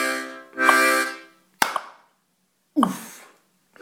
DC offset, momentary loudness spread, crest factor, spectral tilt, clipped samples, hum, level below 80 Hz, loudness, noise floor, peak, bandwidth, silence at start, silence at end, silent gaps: under 0.1%; 19 LU; 24 dB; -2.5 dB/octave; under 0.1%; none; -68 dBFS; -21 LUFS; -69 dBFS; 0 dBFS; 19 kHz; 0 s; 0.65 s; none